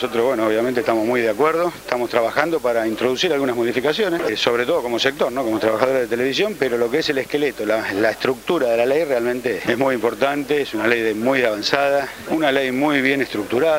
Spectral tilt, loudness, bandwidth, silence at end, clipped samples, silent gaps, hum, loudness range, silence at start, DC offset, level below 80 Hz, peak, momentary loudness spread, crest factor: -4.5 dB/octave; -19 LUFS; 16 kHz; 0 s; under 0.1%; none; none; 1 LU; 0 s; under 0.1%; -54 dBFS; 0 dBFS; 4 LU; 18 dB